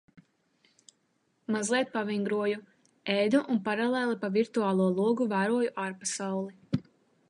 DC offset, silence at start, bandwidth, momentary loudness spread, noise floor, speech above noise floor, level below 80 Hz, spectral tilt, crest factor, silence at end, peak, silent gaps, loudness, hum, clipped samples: under 0.1%; 1.5 s; 11.5 kHz; 9 LU; -73 dBFS; 45 dB; -72 dBFS; -5 dB/octave; 18 dB; 0.5 s; -12 dBFS; none; -29 LUFS; none; under 0.1%